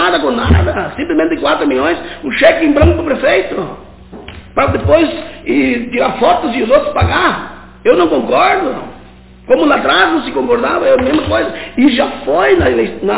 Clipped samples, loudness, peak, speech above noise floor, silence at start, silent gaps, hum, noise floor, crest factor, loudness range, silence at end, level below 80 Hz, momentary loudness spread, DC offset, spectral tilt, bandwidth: 0.1%; -12 LUFS; 0 dBFS; 26 dB; 0 s; none; none; -37 dBFS; 12 dB; 2 LU; 0 s; -26 dBFS; 10 LU; under 0.1%; -10 dB/octave; 4 kHz